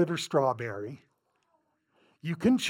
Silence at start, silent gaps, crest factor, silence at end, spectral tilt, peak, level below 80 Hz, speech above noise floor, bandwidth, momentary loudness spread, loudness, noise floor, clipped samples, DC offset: 0 s; none; 18 dB; 0 s; -5.5 dB/octave; -14 dBFS; -66 dBFS; 46 dB; 16.5 kHz; 15 LU; -30 LUFS; -74 dBFS; under 0.1%; under 0.1%